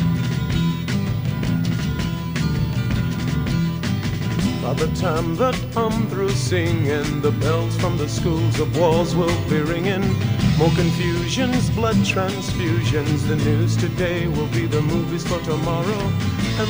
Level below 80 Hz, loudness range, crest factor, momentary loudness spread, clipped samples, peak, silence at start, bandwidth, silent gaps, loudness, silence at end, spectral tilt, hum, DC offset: -36 dBFS; 3 LU; 16 dB; 4 LU; under 0.1%; -4 dBFS; 0 s; 16 kHz; none; -21 LUFS; 0 s; -6 dB/octave; none; 0.4%